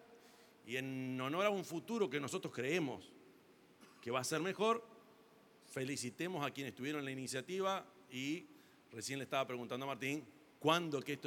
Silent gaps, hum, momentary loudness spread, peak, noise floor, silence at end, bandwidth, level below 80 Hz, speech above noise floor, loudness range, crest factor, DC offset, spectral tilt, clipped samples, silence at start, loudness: none; none; 10 LU; -18 dBFS; -66 dBFS; 0 s; 19 kHz; -90 dBFS; 26 dB; 2 LU; 24 dB; under 0.1%; -4 dB/octave; under 0.1%; 0 s; -40 LUFS